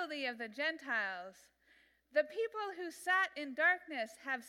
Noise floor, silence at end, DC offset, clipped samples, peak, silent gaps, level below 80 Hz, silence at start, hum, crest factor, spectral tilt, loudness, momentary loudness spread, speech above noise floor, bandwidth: -70 dBFS; 0 s; under 0.1%; under 0.1%; -18 dBFS; none; -86 dBFS; 0 s; none; 20 dB; -2 dB/octave; -36 LUFS; 10 LU; 32 dB; 16 kHz